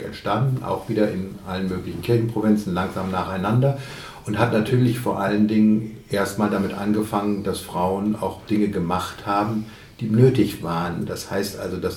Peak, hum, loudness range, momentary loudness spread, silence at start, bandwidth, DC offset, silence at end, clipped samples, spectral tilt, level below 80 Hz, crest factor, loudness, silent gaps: -4 dBFS; none; 2 LU; 10 LU; 0 s; 17.5 kHz; under 0.1%; 0 s; under 0.1%; -7 dB/octave; -50 dBFS; 18 dB; -22 LUFS; none